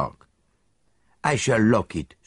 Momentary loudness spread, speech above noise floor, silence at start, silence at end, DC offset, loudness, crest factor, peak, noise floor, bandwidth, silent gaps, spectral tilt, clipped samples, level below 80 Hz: 12 LU; 47 dB; 0 s; 0.2 s; under 0.1%; -23 LUFS; 20 dB; -6 dBFS; -69 dBFS; 11.5 kHz; none; -5.5 dB/octave; under 0.1%; -50 dBFS